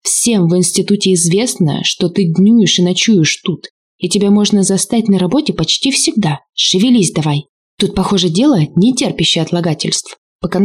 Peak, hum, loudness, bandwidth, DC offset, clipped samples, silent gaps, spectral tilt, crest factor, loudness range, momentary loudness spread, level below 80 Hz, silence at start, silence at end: -2 dBFS; none; -12 LUFS; 15.5 kHz; under 0.1%; under 0.1%; 3.70-3.99 s, 7.49-7.77 s, 10.18-10.39 s; -4.5 dB/octave; 10 dB; 2 LU; 7 LU; -44 dBFS; 0.05 s; 0 s